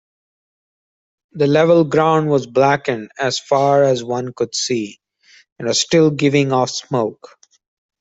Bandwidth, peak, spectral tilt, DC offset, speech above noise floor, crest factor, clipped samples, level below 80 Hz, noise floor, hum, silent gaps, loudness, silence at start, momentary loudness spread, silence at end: 8.2 kHz; 0 dBFS; -5 dB/octave; under 0.1%; 36 dB; 18 dB; under 0.1%; -60 dBFS; -52 dBFS; none; 5.52-5.56 s; -16 LUFS; 1.35 s; 9 LU; 0.9 s